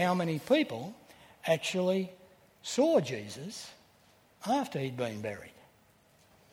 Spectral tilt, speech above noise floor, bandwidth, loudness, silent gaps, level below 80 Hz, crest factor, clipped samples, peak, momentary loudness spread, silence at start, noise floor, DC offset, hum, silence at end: -5 dB/octave; 33 dB; 17 kHz; -32 LUFS; none; -74 dBFS; 20 dB; under 0.1%; -14 dBFS; 17 LU; 0 s; -64 dBFS; under 0.1%; none; 1 s